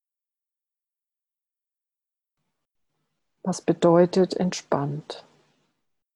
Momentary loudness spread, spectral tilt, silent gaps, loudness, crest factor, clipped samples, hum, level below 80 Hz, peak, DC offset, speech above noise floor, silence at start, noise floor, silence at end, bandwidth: 17 LU; -6.5 dB/octave; none; -23 LUFS; 20 dB; under 0.1%; none; -70 dBFS; -6 dBFS; under 0.1%; 67 dB; 3.45 s; -89 dBFS; 0.95 s; 11 kHz